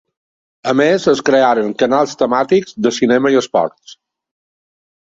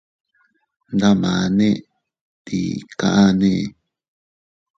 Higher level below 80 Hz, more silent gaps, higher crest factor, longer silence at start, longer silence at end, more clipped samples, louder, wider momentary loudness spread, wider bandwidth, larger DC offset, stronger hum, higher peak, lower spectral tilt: second, -58 dBFS vs -50 dBFS; second, none vs 2.21-2.45 s; about the same, 14 dB vs 18 dB; second, 0.65 s vs 0.9 s; about the same, 1.1 s vs 1.05 s; neither; first, -14 LUFS vs -18 LUFS; second, 6 LU vs 11 LU; about the same, 7.8 kHz vs 7.6 kHz; neither; neither; about the same, -2 dBFS vs -4 dBFS; second, -5 dB/octave vs -6.5 dB/octave